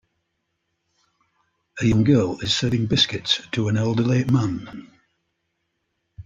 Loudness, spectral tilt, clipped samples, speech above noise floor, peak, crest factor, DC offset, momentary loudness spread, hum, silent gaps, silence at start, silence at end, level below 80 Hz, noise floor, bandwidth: -21 LUFS; -5.5 dB/octave; under 0.1%; 55 dB; -6 dBFS; 18 dB; under 0.1%; 13 LU; none; none; 1.75 s; 0.05 s; -50 dBFS; -75 dBFS; 8.8 kHz